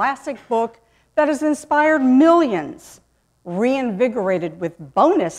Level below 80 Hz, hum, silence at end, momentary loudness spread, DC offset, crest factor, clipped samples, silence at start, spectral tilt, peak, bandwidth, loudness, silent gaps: -60 dBFS; none; 0 s; 14 LU; under 0.1%; 16 dB; under 0.1%; 0 s; -6 dB/octave; -2 dBFS; 12.5 kHz; -18 LUFS; none